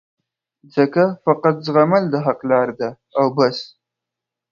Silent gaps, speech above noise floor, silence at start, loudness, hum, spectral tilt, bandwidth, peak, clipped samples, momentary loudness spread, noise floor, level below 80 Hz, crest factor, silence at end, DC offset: none; 67 dB; 0.75 s; -18 LUFS; none; -7.5 dB/octave; 7 kHz; 0 dBFS; under 0.1%; 9 LU; -84 dBFS; -66 dBFS; 18 dB; 0.85 s; under 0.1%